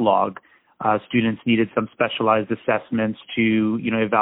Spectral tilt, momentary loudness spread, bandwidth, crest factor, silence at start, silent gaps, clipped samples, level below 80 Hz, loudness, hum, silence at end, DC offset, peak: -11 dB/octave; 5 LU; 4 kHz; 18 dB; 0 s; none; under 0.1%; -60 dBFS; -21 LUFS; none; 0 s; under 0.1%; -2 dBFS